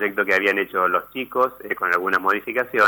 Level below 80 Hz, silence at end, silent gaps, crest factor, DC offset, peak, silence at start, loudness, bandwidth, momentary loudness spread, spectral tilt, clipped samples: -64 dBFS; 0 s; none; 14 dB; under 0.1%; -6 dBFS; 0 s; -21 LUFS; over 20 kHz; 5 LU; -4.5 dB/octave; under 0.1%